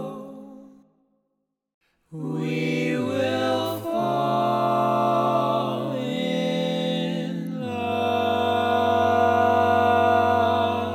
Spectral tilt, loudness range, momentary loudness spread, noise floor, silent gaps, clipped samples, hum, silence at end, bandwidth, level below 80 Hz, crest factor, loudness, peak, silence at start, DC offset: -6.5 dB/octave; 7 LU; 10 LU; -77 dBFS; 1.74-1.81 s; under 0.1%; none; 0 s; 16 kHz; -70 dBFS; 14 dB; -23 LUFS; -8 dBFS; 0 s; under 0.1%